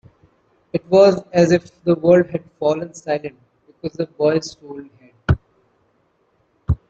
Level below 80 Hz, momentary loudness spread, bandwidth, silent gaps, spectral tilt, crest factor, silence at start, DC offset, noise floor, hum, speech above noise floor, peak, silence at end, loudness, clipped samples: -40 dBFS; 19 LU; 8 kHz; none; -7 dB/octave; 18 dB; 0.75 s; under 0.1%; -63 dBFS; none; 46 dB; -2 dBFS; 0.15 s; -18 LUFS; under 0.1%